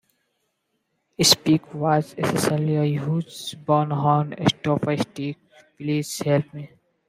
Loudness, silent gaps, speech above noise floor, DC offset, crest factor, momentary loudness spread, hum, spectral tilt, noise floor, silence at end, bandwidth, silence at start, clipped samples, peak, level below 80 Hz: -22 LUFS; none; 52 dB; under 0.1%; 20 dB; 14 LU; none; -4.5 dB/octave; -74 dBFS; 0.45 s; 15.5 kHz; 1.2 s; under 0.1%; -2 dBFS; -60 dBFS